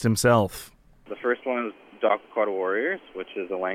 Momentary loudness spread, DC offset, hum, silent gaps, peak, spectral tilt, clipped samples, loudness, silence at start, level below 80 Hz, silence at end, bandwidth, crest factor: 15 LU; under 0.1%; none; none; -6 dBFS; -5 dB/octave; under 0.1%; -26 LUFS; 0 s; -56 dBFS; 0 s; 16 kHz; 18 dB